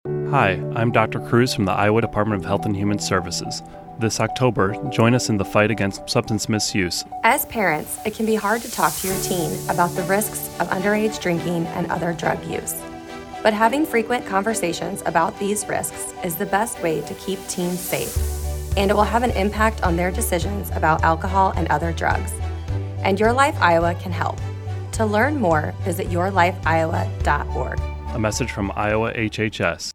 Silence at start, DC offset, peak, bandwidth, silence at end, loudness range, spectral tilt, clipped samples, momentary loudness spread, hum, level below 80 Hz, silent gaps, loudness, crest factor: 0.05 s; under 0.1%; 0 dBFS; 19.5 kHz; 0.05 s; 3 LU; -5 dB/octave; under 0.1%; 8 LU; none; -34 dBFS; none; -21 LUFS; 20 dB